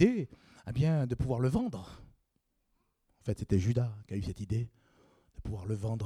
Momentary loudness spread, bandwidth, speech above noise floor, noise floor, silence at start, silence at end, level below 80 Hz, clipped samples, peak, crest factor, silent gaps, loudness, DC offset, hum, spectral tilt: 14 LU; 11.5 kHz; 47 dB; -78 dBFS; 0 s; 0 s; -52 dBFS; under 0.1%; -12 dBFS; 22 dB; none; -34 LUFS; under 0.1%; none; -8 dB/octave